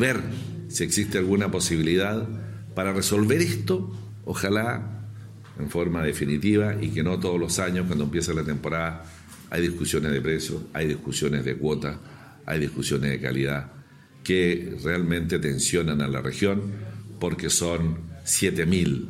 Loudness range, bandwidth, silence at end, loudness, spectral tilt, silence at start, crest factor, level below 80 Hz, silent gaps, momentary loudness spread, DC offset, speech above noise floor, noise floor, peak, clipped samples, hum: 3 LU; 16 kHz; 0 s; -25 LUFS; -4.5 dB/octave; 0 s; 18 dB; -46 dBFS; none; 12 LU; under 0.1%; 23 dB; -48 dBFS; -8 dBFS; under 0.1%; none